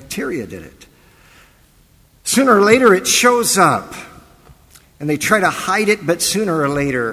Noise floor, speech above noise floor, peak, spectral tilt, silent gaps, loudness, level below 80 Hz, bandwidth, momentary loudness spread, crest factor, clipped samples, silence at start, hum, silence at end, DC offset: -51 dBFS; 36 dB; 0 dBFS; -3.5 dB/octave; none; -14 LUFS; -48 dBFS; 16 kHz; 16 LU; 16 dB; under 0.1%; 0 s; none; 0 s; under 0.1%